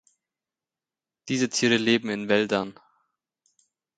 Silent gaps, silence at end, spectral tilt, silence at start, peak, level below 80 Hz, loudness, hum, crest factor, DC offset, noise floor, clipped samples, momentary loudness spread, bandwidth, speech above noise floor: none; 1.25 s; -3.5 dB/octave; 1.25 s; -6 dBFS; -68 dBFS; -24 LUFS; none; 22 dB; under 0.1%; under -90 dBFS; under 0.1%; 8 LU; 9.4 kHz; over 66 dB